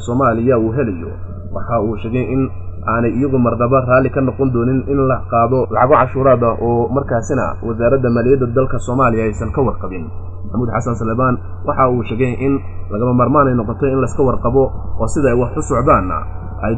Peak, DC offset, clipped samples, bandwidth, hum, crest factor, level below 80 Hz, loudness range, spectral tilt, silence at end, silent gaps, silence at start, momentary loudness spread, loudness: 0 dBFS; under 0.1%; under 0.1%; 9.4 kHz; none; 14 dB; -30 dBFS; 4 LU; -8.5 dB/octave; 0 s; none; 0 s; 10 LU; -16 LUFS